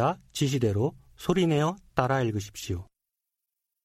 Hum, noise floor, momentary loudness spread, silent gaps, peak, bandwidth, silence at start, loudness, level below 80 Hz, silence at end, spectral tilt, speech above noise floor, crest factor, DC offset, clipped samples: none; -86 dBFS; 10 LU; none; -8 dBFS; 16 kHz; 0 s; -28 LUFS; -54 dBFS; 1 s; -6 dB/octave; 59 dB; 20 dB; under 0.1%; under 0.1%